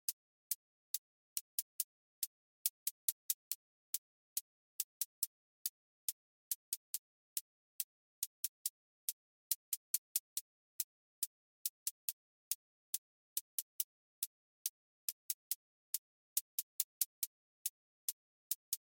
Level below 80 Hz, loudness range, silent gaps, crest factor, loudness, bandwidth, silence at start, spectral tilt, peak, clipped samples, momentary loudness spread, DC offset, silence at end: under -90 dBFS; 2 LU; 0.13-18.72 s; 32 dB; -43 LUFS; 17 kHz; 0.1 s; 9 dB/octave; -14 dBFS; under 0.1%; 6 LU; under 0.1%; 0.15 s